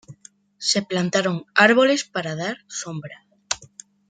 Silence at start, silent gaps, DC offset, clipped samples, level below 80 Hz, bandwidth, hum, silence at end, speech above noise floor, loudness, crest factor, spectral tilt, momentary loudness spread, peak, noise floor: 0.1 s; none; under 0.1%; under 0.1%; -66 dBFS; 9.6 kHz; none; 0.45 s; 30 dB; -21 LUFS; 22 dB; -3.5 dB/octave; 16 LU; -2 dBFS; -51 dBFS